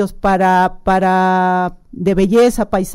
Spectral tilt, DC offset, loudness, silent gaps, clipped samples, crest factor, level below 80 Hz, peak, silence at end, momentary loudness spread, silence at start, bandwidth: -6.5 dB/octave; under 0.1%; -14 LUFS; none; under 0.1%; 10 dB; -34 dBFS; -4 dBFS; 0 s; 6 LU; 0 s; 16 kHz